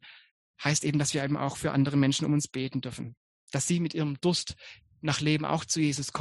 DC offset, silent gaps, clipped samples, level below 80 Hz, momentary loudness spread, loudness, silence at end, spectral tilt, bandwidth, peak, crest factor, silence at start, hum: under 0.1%; 0.31-0.54 s, 3.17-3.47 s; under 0.1%; -60 dBFS; 12 LU; -29 LUFS; 0 s; -4.5 dB/octave; 12 kHz; -10 dBFS; 20 dB; 0.05 s; none